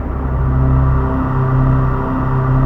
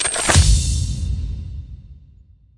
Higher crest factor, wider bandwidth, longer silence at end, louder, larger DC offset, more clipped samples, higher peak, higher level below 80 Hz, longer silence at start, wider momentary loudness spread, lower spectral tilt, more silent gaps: second, 12 dB vs 18 dB; second, 3.3 kHz vs 11.5 kHz; second, 0 s vs 0.65 s; about the same, -16 LUFS vs -18 LUFS; neither; neither; about the same, -2 dBFS vs -2 dBFS; first, -18 dBFS vs -24 dBFS; about the same, 0 s vs 0 s; second, 4 LU vs 20 LU; first, -11 dB/octave vs -3.5 dB/octave; neither